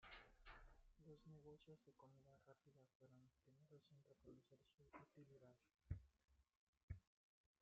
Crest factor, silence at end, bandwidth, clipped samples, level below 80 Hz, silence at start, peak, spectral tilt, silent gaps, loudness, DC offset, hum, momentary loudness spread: 28 dB; 0.55 s; 6.8 kHz; under 0.1%; -72 dBFS; 0 s; -38 dBFS; -5.5 dB/octave; 2.95-3.00 s, 6.57-6.73 s, 6.83-6.88 s; -64 LUFS; under 0.1%; none; 11 LU